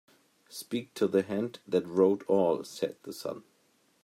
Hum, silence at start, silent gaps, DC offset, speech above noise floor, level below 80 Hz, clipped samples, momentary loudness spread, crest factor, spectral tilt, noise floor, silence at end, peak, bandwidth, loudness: none; 0.5 s; none; under 0.1%; 39 dB; -78 dBFS; under 0.1%; 14 LU; 20 dB; -6 dB/octave; -69 dBFS; 0.65 s; -12 dBFS; 16 kHz; -30 LUFS